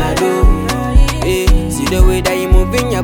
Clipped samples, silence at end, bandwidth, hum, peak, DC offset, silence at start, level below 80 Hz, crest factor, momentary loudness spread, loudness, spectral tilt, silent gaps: under 0.1%; 0 s; 19 kHz; none; 0 dBFS; under 0.1%; 0 s; -14 dBFS; 10 dB; 3 LU; -14 LUFS; -5.5 dB/octave; none